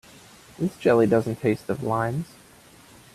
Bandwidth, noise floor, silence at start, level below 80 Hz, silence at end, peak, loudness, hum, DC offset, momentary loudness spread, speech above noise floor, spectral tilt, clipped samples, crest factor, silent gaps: 14.5 kHz; -51 dBFS; 0.6 s; -58 dBFS; 0.9 s; -6 dBFS; -24 LUFS; none; under 0.1%; 11 LU; 28 dB; -7.5 dB/octave; under 0.1%; 18 dB; none